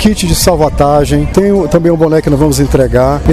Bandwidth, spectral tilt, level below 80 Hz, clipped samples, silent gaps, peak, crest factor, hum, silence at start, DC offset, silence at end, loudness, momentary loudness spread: 15.5 kHz; -6 dB/octave; -20 dBFS; 0.3%; none; 0 dBFS; 8 dB; none; 0 s; 0.8%; 0 s; -9 LUFS; 1 LU